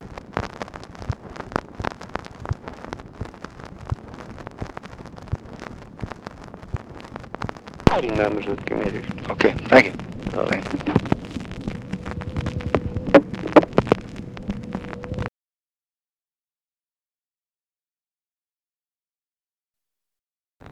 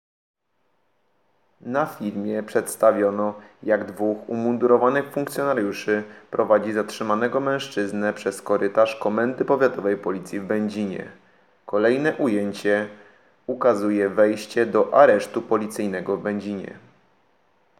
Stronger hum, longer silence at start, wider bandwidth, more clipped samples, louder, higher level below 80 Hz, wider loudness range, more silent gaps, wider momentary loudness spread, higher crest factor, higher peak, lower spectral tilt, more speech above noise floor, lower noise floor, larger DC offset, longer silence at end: neither; second, 0 s vs 1.65 s; second, 11.5 kHz vs 16.5 kHz; neither; about the same, -24 LUFS vs -22 LUFS; first, -42 dBFS vs -76 dBFS; first, 15 LU vs 4 LU; first, 16.83-16.87 s vs none; first, 21 LU vs 10 LU; about the same, 24 dB vs 20 dB; about the same, 0 dBFS vs -2 dBFS; first, -7 dB/octave vs -5.5 dB/octave; first, over 69 dB vs 49 dB; first, under -90 dBFS vs -71 dBFS; neither; second, 0 s vs 1 s